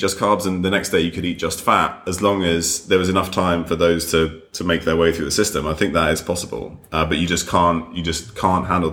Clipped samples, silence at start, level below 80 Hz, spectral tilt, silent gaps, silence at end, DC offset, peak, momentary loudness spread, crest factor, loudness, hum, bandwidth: under 0.1%; 0 s; -40 dBFS; -4 dB/octave; none; 0 s; under 0.1%; -2 dBFS; 7 LU; 18 dB; -19 LUFS; none; 19.5 kHz